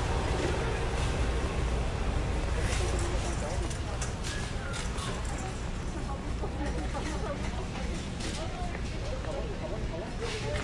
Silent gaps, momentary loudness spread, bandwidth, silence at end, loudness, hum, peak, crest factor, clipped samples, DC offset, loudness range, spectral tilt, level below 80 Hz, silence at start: none; 5 LU; 11.5 kHz; 0 s; -34 LUFS; none; -18 dBFS; 14 dB; under 0.1%; under 0.1%; 4 LU; -5 dB/octave; -34 dBFS; 0 s